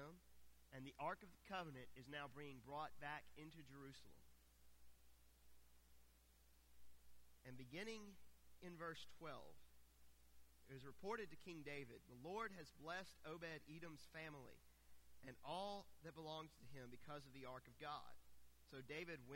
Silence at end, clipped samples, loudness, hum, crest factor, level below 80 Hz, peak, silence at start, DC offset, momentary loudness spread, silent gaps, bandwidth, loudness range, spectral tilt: 0 s; under 0.1%; -56 LUFS; none; 20 dB; -76 dBFS; -36 dBFS; 0 s; under 0.1%; 11 LU; none; 16.5 kHz; 7 LU; -4.5 dB/octave